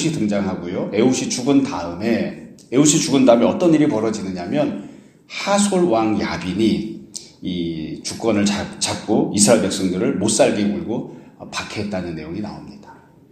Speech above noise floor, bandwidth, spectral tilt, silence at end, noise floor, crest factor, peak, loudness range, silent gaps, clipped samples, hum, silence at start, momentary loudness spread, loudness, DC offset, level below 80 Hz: 26 dB; 15 kHz; -4.5 dB/octave; 0.4 s; -45 dBFS; 20 dB; 0 dBFS; 5 LU; none; under 0.1%; none; 0 s; 15 LU; -19 LUFS; under 0.1%; -52 dBFS